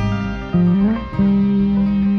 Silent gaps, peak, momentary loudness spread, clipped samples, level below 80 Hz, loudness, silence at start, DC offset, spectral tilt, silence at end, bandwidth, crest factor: none; -6 dBFS; 5 LU; under 0.1%; -32 dBFS; -17 LUFS; 0 s; under 0.1%; -9.5 dB/octave; 0 s; 6.2 kHz; 10 dB